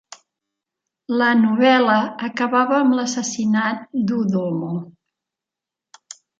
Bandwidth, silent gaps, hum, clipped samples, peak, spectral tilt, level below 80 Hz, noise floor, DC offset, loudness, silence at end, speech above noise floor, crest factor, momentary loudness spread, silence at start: 7.8 kHz; none; none; under 0.1%; -2 dBFS; -5 dB/octave; -70 dBFS; -87 dBFS; under 0.1%; -19 LUFS; 1.5 s; 69 dB; 18 dB; 10 LU; 1.1 s